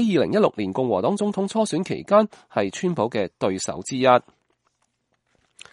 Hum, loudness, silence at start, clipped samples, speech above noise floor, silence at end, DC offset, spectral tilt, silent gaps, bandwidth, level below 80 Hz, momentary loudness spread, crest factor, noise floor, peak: none; -22 LUFS; 0 s; under 0.1%; 50 dB; 1.5 s; under 0.1%; -5.5 dB/octave; none; 11.5 kHz; -64 dBFS; 8 LU; 20 dB; -71 dBFS; -2 dBFS